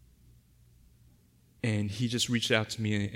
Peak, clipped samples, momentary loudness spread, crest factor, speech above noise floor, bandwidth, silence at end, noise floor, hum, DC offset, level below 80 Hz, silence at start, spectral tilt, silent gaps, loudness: -10 dBFS; under 0.1%; 5 LU; 22 dB; 33 dB; 16 kHz; 0 s; -63 dBFS; none; under 0.1%; -62 dBFS; 1.65 s; -4.5 dB/octave; none; -30 LUFS